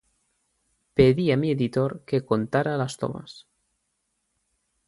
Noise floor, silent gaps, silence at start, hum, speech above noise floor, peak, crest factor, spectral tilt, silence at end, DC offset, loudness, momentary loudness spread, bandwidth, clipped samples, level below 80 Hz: -76 dBFS; none; 0.95 s; none; 52 dB; -4 dBFS; 22 dB; -7 dB/octave; 1.5 s; under 0.1%; -24 LUFS; 13 LU; 11.5 kHz; under 0.1%; -54 dBFS